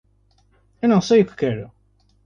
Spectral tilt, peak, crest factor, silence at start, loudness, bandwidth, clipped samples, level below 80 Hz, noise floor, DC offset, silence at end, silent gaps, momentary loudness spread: -6.5 dB/octave; -4 dBFS; 16 dB; 0.85 s; -19 LUFS; 7.2 kHz; under 0.1%; -56 dBFS; -60 dBFS; under 0.1%; 0.6 s; none; 15 LU